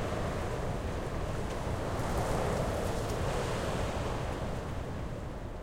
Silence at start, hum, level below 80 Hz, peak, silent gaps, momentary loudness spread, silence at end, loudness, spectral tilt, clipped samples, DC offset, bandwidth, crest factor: 0 s; none; -40 dBFS; -18 dBFS; none; 6 LU; 0 s; -35 LUFS; -6 dB/octave; under 0.1%; under 0.1%; 16 kHz; 16 dB